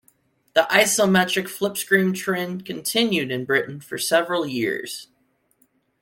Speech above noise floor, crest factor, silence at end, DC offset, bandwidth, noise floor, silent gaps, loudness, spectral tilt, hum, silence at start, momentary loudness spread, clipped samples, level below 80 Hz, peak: 44 dB; 20 dB; 0.95 s; under 0.1%; 17 kHz; -66 dBFS; none; -21 LUFS; -3.5 dB/octave; none; 0.55 s; 11 LU; under 0.1%; -66 dBFS; -2 dBFS